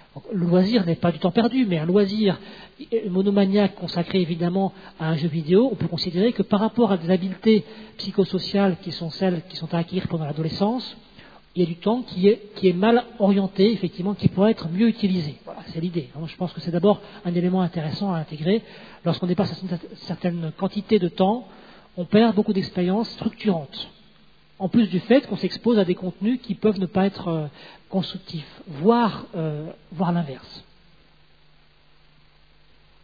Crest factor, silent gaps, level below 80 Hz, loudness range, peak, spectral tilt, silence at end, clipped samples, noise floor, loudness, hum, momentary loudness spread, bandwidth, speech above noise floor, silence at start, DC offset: 20 dB; none; -58 dBFS; 5 LU; -4 dBFS; -9 dB/octave; 2.45 s; under 0.1%; -57 dBFS; -23 LUFS; none; 12 LU; 5 kHz; 35 dB; 0.15 s; 0.2%